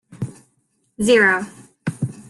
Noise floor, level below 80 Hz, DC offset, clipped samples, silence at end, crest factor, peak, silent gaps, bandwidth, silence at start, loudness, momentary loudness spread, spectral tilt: -66 dBFS; -54 dBFS; under 0.1%; under 0.1%; 0.1 s; 18 dB; -2 dBFS; none; 12.5 kHz; 0.1 s; -18 LUFS; 18 LU; -5 dB/octave